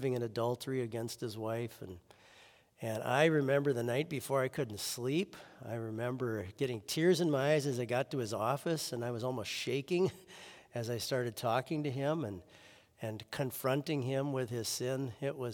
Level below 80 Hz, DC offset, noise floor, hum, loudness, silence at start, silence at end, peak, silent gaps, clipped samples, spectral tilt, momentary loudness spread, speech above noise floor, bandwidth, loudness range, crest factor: -76 dBFS; under 0.1%; -62 dBFS; none; -35 LUFS; 0 s; 0 s; -14 dBFS; none; under 0.1%; -5 dB/octave; 13 LU; 27 dB; 18 kHz; 4 LU; 20 dB